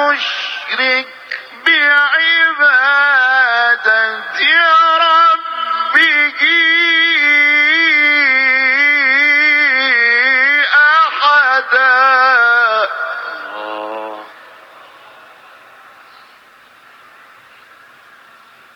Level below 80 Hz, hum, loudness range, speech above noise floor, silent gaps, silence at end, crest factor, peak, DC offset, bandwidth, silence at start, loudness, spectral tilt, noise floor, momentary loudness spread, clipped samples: -72 dBFS; none; 7 LU; 31 dB; none; 4.45 s; 14 dB; 0 dBFS; under 0.1%; 9 kHz; 0 s; -10 LUFS; -0.5 dB/octave; -44 dBFS; 12 LU; under 0.1%